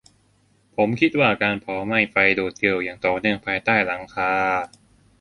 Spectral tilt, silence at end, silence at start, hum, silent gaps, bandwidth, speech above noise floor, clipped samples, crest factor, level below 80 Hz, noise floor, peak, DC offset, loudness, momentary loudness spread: -6 dB/octave; 0.55 s; 0.8 s; none; none; 11 kHz; 40 dB; under 0.1%; 20 dB; -56 dBFS; -61 dBFS; -2 dBFS; under 0.1%; -21 LUFS; 7 LU